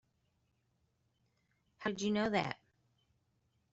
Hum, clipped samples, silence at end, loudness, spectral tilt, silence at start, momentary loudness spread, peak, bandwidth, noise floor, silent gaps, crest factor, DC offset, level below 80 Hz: none; under 0.1%; 1.2 s; -36 LUFS; -4 dB/octave; 1.8 s; 9 LU; -18 dBFS; 8 kHz; -79 dBFS; none; 24 dB; under 0.1%; -72 dBFS